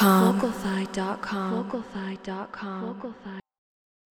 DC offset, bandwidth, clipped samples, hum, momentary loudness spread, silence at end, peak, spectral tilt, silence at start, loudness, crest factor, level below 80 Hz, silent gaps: under 0.1%; 18 kHz; under 0.1%; none; 16 LU; 0.7 s; -6 dBFS; -6 dB/octave; 0 s; -28 LUFS; 22 dB; -60 dBFS; none